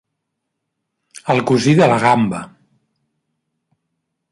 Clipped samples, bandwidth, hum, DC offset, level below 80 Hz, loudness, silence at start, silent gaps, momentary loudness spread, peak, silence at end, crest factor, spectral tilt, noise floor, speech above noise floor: under 0.1%; 11.5 kHz; none; under 0.1%; -58 dBFS; -14 LUFS; 1.25 s; none; 14 LU; -2 dBFS; 1.85 s; 18 dB; -6 dB/octave; -76 dBFS; 62 dB